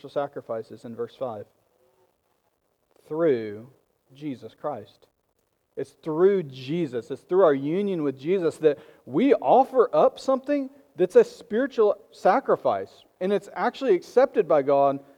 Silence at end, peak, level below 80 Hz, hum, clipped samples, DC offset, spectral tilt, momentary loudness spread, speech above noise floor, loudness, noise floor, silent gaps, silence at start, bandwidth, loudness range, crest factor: 0.2 s; -6 dBFS; -74 dBFS; none; under 0.1%; under 0.1%; -7 dB/octave; 16 LU; 49 dB; -24 LUFS; -72 dBFS; none; 0.05 s; 11.5 kHz; 10 LU; 18 dB